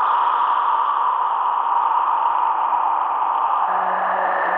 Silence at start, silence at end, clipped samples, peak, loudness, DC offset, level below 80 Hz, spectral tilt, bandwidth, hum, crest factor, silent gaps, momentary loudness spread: 0 s; 0 s; under 0.1%; -8 dBFS; -19 LUFS; under 0.1%; under -90 dBFS; -5.5 dB/octave; 4.1 kHz; none; 12 dB; none; 2 LU